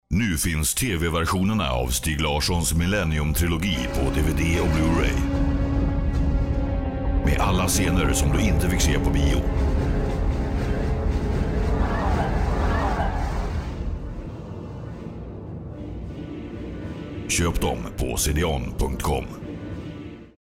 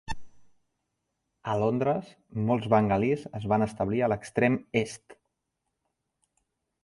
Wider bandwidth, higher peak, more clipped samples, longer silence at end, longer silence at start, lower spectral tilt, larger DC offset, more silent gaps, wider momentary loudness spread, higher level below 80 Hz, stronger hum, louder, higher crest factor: first, 16.5 kHz vs 11.5 kHz; second, -12 dBFS vs -8 dBFS; neither; second, 0.25 s vs 1.7 s; about the same, 0.1 s vs 0.1 s; second, -5 dB/octave vs -7 dB/octave; neither; neither; about the same, 14 LU vs 15 LU; first, -26 dBFS vs -56 dBFS; neither; first, -24 LUFS vs -27 LUFS; second, 10 dB vs 22 dB